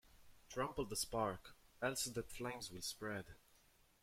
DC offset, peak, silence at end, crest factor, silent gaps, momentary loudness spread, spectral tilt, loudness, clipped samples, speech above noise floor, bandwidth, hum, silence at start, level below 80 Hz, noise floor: under 0.1%; -26 dBFS; 0.65 s; 20 dB; none; 10 LU; -3 dB/octave; -44 LUFS; under 0.1%; 28 dB; 16.5 kHz; none; 0.05 s; -64 dBFS; -72 dBFS